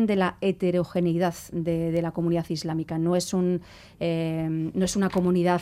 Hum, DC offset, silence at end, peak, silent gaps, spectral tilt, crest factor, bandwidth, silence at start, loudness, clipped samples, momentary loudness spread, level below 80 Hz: none; under 0.1%; 0 s; -10 dBFS; none; -6.5 dB/octave; 14 dB; 15 kHz; 0 s; -26 LUFS; under 0.1%; 6 LU; -54 dBFS